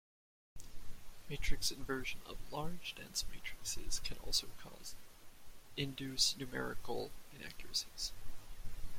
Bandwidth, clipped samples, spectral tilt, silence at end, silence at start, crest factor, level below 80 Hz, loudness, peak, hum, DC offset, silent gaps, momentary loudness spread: 16.5 kHz; under 0.1%; -2 dB/octave; 0 s; 0.55 s; 20 dB; -48 dBFS; -41 LUFS; -18 dBFS; none; under 0.1%; none; 21 LU